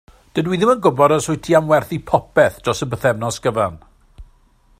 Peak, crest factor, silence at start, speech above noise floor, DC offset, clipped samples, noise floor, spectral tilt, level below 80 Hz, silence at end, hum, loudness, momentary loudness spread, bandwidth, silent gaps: 0 dBFS; 18 dB; 0.35 s; 37 dB; under 0.1%; under 0.1%; -53 dBFS; -5.5 dB/octave; -46 dBFS; 0.55 s; none; -17 LUFS; 7 LU; 15.5 kHz; none